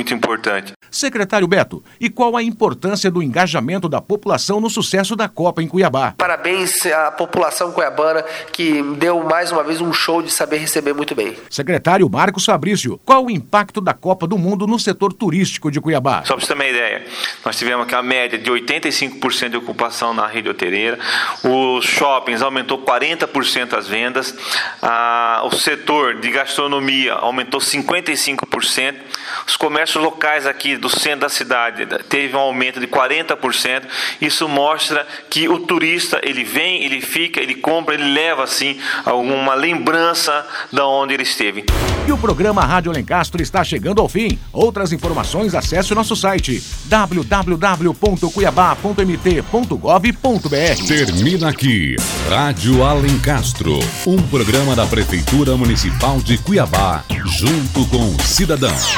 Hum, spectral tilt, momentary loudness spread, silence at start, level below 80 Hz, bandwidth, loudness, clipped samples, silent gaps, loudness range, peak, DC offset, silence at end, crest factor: none; -4 dB/octave; 5 LU; 0 s; -30 dBFS; 19 kHz; -16 LUFS; under 0.1%; 0.76-0.80 s; 2 LU; 0 dBFS; under 0.1%; 0 s; 16 dB